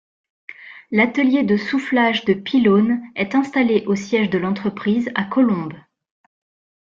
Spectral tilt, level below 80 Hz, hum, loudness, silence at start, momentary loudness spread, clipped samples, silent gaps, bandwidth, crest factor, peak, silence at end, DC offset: -6.5 dB/octave; -60 dBFS; none; -18 LUFS; 0.5 s; 7 LU; under 0.1%; none; 7.4 kHz; 16 dB; -4 dBFS; 1.05 s; under 0.1%